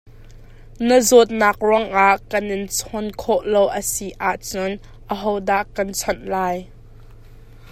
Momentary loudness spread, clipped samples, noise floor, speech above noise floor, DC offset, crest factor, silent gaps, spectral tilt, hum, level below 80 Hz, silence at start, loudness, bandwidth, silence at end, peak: 12 LU; under 0.1%; -42 dBFS; 23 dB; under 0.1%; 20 dB; none; -3.5 dB/octave; none; -42 dBFS; 0.05 s; -19 LUFS; 16 kHz; 0.05 s; 0 dBFS